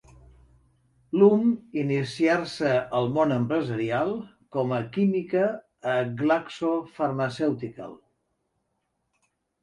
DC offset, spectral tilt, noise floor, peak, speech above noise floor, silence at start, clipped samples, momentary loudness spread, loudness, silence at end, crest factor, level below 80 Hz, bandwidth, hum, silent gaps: under 0.1%; -7.5 dB/octave; -77 dBFS; -6 dBFS; 52 dB; 1.15 s; under 0.1%; 9 LU; -25 LUFS; 1.65 s; 20 dB; -64 dBFS; 11.5 kHz; none; none